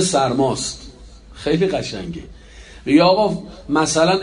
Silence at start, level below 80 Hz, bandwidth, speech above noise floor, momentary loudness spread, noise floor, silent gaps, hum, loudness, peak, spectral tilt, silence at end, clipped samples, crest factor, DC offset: 0 s; -42 dBFS; 10.5 kHz; 23 dB; 17 LU; -40 dBFS; none; none; -18 LUFS; -2 dBFS; -4.5 dB/octave; 0 s; under 0.1%; 16 dB; under 0.1%